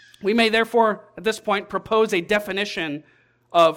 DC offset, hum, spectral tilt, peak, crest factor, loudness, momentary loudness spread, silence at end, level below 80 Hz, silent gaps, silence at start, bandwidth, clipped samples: under 0.1%; none; -4 dB/octave; -4 dBFS; 18 dB; -21 LUFS; 8 LU; 0 s; -58 dBFS; none; 0.2 s; 17 kHz; under 0.1%